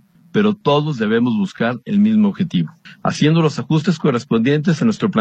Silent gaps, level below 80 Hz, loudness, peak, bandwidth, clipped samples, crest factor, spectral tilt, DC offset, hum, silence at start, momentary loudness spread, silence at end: none; -58 dBFS; -17 LUFS; -2 dBFS; 8.6 kHz; under 0.1%; 14 dB; -7 dB/octave; under 0.1%; none; 0.35 s; 7 LU; 0 s